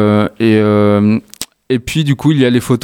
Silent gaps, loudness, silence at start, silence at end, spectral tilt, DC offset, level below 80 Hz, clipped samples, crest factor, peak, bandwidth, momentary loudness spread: none; -12 LUFS; 0 s; 0.05 s; -6.5 dB/octave; under 0.1%; -44 dBFS; under 0.1%; 12 dB; 0 dBFS; 18 kHz; 8 LU